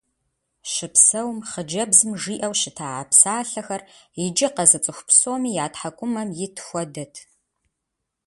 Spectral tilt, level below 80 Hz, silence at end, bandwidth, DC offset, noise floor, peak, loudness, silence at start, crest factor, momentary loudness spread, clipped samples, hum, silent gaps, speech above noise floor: -2 dB/octave; -66 dBFS; 1.05 s; 12 kHz; under 0.1%; -80 dBFS; 0 dBFS; -19 LUFS; 0.65 s; 22 dB; 17 LU; under 0.1%; none; none; 59 dB